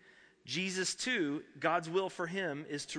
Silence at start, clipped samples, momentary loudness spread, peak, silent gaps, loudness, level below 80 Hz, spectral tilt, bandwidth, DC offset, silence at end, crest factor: 0.05 s; under 0.1%; 6 LU; -16 dBFS; none; -35 LUFS; -76 dBFS; -3.5 dB/octave; 10.5 kHz; under 0.1%; 0 s; 20 dB